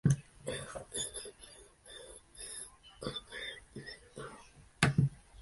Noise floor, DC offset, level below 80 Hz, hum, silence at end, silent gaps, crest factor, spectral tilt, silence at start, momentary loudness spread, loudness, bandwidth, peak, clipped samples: -57 dBFS; under 0.1%; -58 dBFS; none; 0 s; none; 28 dB; -4.5 dB/octave; 0.05 s; 20 LU; -38 LUFS; 12 kHz; -10 dBFS; under 0.1%